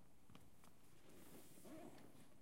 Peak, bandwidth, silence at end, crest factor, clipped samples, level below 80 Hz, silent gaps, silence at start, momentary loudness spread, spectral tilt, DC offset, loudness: -46 dBFS; 16 kHz; 0 s; 16 dB; under 0.1%; -82 dBFS; none; 0 s; 9 LU; -4.5 dB/octave; under 0.1%; -64 LUFS